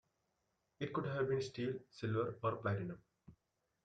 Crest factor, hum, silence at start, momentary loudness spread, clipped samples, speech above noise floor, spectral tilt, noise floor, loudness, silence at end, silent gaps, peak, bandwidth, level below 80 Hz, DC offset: 18 dB; none; 0.8 s; 8 LU; under 0.1%; 45 dB; -7 dB/octave; -84 dBFS; -41 LUFS; 0.55 s; none; -24 dBFS; 9 kHz; -74 dBFS; under 0.1%